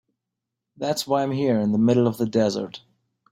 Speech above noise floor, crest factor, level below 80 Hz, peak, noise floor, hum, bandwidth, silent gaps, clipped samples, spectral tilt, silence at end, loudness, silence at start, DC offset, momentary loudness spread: 62 dB; 16 dB; -62 dBFS; -8 dBFS; -84 dBFS; none; 16 kHz; none; under 0.1%; -6.5 dB/octave; 0.55 s; -22 LUFS; 0.8 s; under 0.1%; 11 LU